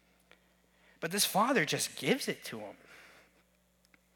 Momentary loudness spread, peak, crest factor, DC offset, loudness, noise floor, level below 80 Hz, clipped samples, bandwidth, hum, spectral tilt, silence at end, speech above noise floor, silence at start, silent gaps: 18 LU; -12 dBFS; 24 dB; under 0.1%; -31 LUFS; -70 dBFS; -78 dBFS; under 0.1%; 19 kHz; none; -3 dB/octave; 1.1 s; 38 dB; 1 s; none